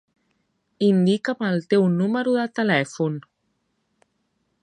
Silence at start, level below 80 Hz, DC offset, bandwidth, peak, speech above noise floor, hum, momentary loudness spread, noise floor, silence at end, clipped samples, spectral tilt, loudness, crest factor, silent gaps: 0.8 s; -70 dBFS; under 0.1%; 9.4 kHz; -6 dBFS; 52 dB; none; 7 LU; -72 dBFS; 1.4 s; under 0.1%; -7 dB/octave; -21 LUFS; 18 dB; none